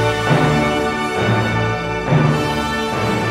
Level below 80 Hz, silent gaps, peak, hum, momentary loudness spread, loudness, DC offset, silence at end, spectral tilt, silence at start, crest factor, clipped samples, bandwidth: -36 dBFS; none; -2 dBFS; none; 4 LU; -17 LUFS; under 0.1%; 0 s; -6 dB/octave; 0 s; 14 dB; under 0.1%; 15 kHz